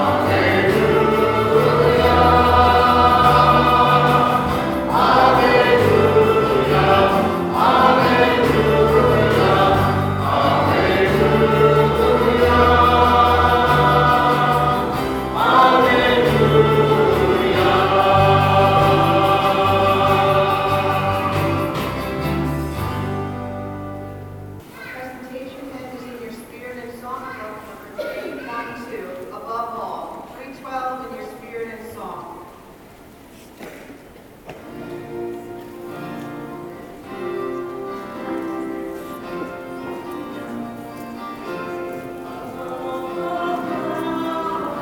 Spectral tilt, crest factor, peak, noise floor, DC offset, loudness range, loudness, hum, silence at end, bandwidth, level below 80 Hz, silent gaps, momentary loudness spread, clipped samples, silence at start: -6.5 dB/octave; 16 dB; 0 dBFS; -43 dBFS; under 0.1%; 19 LU; -16 LUFS; none; 0 s; 19 kHz; -38 dBFS; none; 20 LU; under 0.1%; 0 s